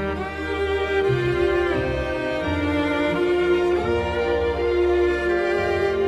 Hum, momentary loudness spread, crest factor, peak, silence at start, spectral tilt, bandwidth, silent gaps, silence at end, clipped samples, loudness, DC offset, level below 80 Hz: none; 5 LU; 12 dB; -10 dBFS; 0 s; -7 dB/octave; 10.5 kHz; none; 0 s; under 0.1%; -22 LUFS; under 0.1%; -36 dBFS